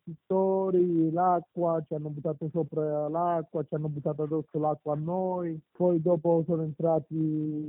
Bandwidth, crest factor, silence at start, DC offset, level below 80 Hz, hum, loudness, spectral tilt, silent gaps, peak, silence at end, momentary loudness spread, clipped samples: 3.6 kHz; 14 dB; 0.05 s; under 0.1%; -72 dBFS; none; -29 LUFS; -13.5 dB/octave; none; -14 dBFS; 0 s; 8 LU; under 0.1%